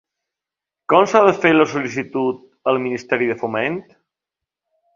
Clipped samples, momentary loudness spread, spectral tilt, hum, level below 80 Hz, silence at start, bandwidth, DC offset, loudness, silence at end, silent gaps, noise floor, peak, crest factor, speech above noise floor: under 0.1%; 11 LU; -5.5 dB/octave; none; -62 dBFS; 0.9 s; 7.4 kHz; under 0.1%; -18 LUFS; 1.15 s; none; -86 dBFS; 0 dBFS; 20 dB; 69 dB